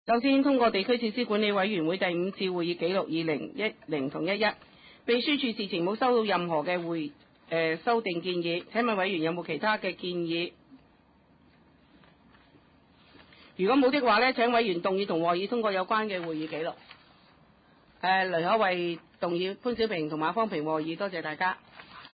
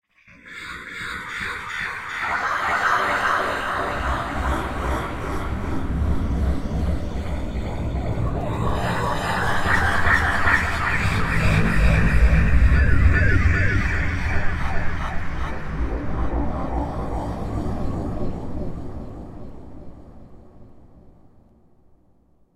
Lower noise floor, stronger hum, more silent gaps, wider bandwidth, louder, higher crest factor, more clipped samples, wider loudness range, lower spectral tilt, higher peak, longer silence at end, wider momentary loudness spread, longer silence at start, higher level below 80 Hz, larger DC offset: first, -62 dBFS vs -57 dBFS; neither; neither; second, 5 kHz vs 14 kHz; second, -28 LUFS vs -23 LUFS; about the same, 16 dB vs 18 dB; neither; second, 6 LU vs 12 LU; first, -9.5 dB/octave vs -6 dB/octave; second, -12 dBFS vs -4 dBFS; second, 0.05 s vs 1.45 s; second, 9 LU vs 13 LU; second, 0.05 s vs 0.45 s; second, -68 dBFS vs -26 dBFS; neither